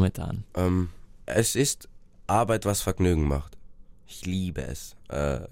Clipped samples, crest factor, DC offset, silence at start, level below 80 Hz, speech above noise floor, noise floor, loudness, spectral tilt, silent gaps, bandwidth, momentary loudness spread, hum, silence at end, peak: under 0.1%; 20 dB; under 0.1%; 0 s; -38 dBFS; 19 dB; -46 dBFS; -27 LUFS; -5 dB/octave; none; 16 kHz; 15 LU; none; 0 s; -6 dBFS